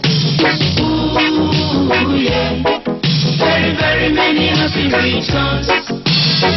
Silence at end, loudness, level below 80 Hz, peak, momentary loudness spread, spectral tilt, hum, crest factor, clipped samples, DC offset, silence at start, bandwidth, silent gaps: 0 s; -13 LUFS; -34 dBFS; 0 dBFS; 3 LU; -3.5 dB/octave; none; 12 dB; under 0.1%; under 0.1%; 0 s; 6.2 kHz; none